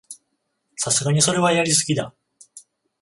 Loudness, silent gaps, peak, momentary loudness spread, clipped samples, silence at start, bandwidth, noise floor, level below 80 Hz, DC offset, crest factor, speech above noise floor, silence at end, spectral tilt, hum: -19 LUFS; none; -4 dBFS; 14 LU; under 0.1%; 0.1 s; 11.5 kHz; -73 dBFS; -60 dBFS; under 0.1%; 18 dB; 54 dB; 0.45 s; -3.5 dB/octave; none